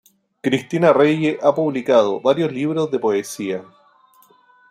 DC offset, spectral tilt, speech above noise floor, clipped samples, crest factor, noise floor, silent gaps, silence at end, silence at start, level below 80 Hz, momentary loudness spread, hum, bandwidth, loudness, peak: under 0.1%; -6 dB/octave; 36 dB; under 0.1%; 18 dB; -53 dBFS; none; 1.1 s; 0.45 s; -64 dBFS; 11 LU; none; 15 kHz; -18 LUFS; -2 dBFS